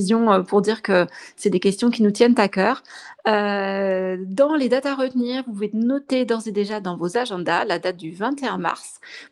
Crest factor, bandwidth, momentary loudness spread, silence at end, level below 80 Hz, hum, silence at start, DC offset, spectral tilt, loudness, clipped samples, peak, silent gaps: 20 dB; 12 kHz; 9 LU; 0.05 s; -68 dBFS; none; 0 s; under 0.1%; -5.5 dB/octave; -21 LUFS; under 0.1%; -2 dBFS; none